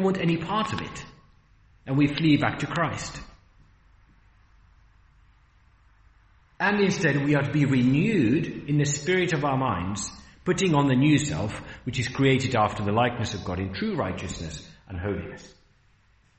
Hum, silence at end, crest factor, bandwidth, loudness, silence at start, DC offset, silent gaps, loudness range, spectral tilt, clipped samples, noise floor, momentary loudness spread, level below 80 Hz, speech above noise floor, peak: none; 0.9 s; 18 dB; 8.4 kHz; -25 LUFS; 0 s; under 0.1%; none; 8 LU; -5.5 dB/octave; under 0.1%; -61 dBFS; 14 LU; -52 dBFS; 37 dB; -8 dBFS